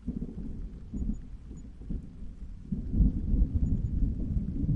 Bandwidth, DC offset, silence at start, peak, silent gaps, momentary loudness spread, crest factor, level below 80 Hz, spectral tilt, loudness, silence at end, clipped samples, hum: 7.2 kHz; under 0.1%; 0 s; -12 dBFS; none; 17 LU; 20 dB; -32 dBFS; -11 dB/octave; -33 LUFS; 0 s; under 0.1%; none